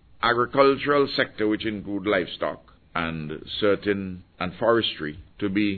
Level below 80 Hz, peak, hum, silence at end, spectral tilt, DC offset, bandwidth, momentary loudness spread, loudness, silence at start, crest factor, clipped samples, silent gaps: -52 dBFS; -4 dBFS; none; 0 s; -8.5 dB/octave; under 0.1%; 4.6 kHz; 13 LU; -24 LUFS; 0.2 s; 20 dB; under 0.1%; none